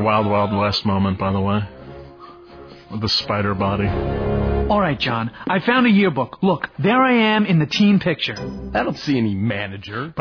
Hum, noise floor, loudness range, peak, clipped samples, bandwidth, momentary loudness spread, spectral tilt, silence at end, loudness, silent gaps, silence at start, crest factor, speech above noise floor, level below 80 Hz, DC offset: none; -41 dBFS; 5 LU; -4 dBFS; under 0.1%; 5.4 kHz; 11 LU; -7 dB/octave; 0 s; -19 LUFS; none; 0 s; 14 dB; 22 dB; -36 dBFS; under 0.1%